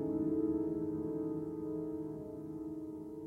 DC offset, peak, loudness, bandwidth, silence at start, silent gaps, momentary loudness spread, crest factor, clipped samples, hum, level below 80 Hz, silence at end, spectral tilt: under 0.1%; -24 dBFS; -39 LUFS; 2.1 kHz; 0 s; none; 10 LU; 14 dB; under 0.1%; none; -64 dBFS; 0 s; -11 dB/octave